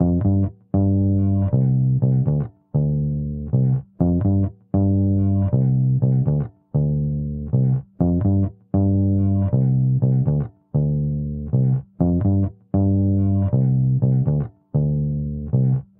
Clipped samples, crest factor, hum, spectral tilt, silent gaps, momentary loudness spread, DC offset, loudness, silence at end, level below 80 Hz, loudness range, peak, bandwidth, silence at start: under 0.1%; 14 dB; none; -16 dB/octave; none; 5 LU; under 0.1%; -20 LUFS; 0.15 s; -38 dBFS; 1 LU; -4 dBFS; 1.6 kHz; 0 s